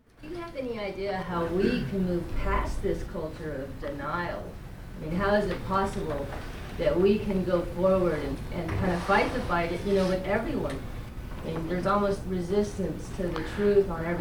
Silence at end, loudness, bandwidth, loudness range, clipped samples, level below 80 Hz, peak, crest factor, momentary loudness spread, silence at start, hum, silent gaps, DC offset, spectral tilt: 0 s; -29 LUFS; 20 kHz; 4 LU; under 0.1%; -38 dBFS; -12 dBFS; 18 dB; 13 LU; 0.2 s; none; none; under 0.1%; -7 dB/octave